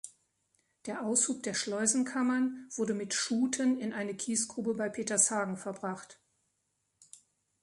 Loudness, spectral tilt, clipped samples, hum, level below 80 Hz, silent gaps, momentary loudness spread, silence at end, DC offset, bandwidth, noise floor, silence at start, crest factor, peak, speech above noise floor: -31 LUFS; -2.5 dB/octave; under 0.1%; none; -78 dBFS; none; 11 LU; 1.5 s; under 0.1%; 11.5 kHz; -80 dBFS; 0.05 s; 24 dB; -10 dBFS; 48 dB